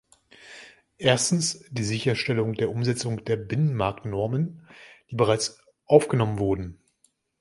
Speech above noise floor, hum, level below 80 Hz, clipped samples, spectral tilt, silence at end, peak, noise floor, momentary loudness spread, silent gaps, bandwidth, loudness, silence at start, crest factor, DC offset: 43 dB; none; -52 dBFS; under 0.1%; -5 dB/octave; 0.65 s; -2 dBFS; -68 dBFS; 12 LU; none; 11.5 kHz; -25 LUFS; 0.45 s; 24 dB; under 0.1%